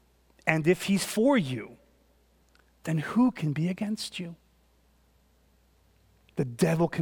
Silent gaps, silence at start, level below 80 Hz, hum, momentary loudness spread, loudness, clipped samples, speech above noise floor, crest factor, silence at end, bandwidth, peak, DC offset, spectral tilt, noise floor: none; 0.45 s; -62 dBFS; none; 15 LU; -28 LUFS; under 0.1%; 38 dB; 24 dB; 0 s; 18 kHz; -6 dBFS; under 0.1%; -6 dB/octave; -64 dBFS